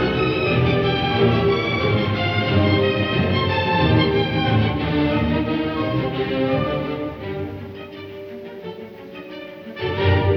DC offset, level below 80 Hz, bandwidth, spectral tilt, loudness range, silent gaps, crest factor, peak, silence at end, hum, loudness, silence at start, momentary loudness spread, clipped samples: under 0.1%; -38 dBFS; 6.2 kHz; -8 dB/octave; 9 LU; none; 16 dB; -4 dBFS; 0 s; none; -20 LUFS; 0 s; 17 LU; under 0.1%